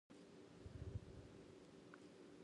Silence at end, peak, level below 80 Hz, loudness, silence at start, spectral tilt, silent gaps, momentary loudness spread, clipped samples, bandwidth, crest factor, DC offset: 0 s; -38 dBFS; -66 dBFS; -59 LUFS; 0.1 s; -6.5 dB/octave; none; 9 LU; under 0.1%; 11 kHz; 20 dB; under 0.1%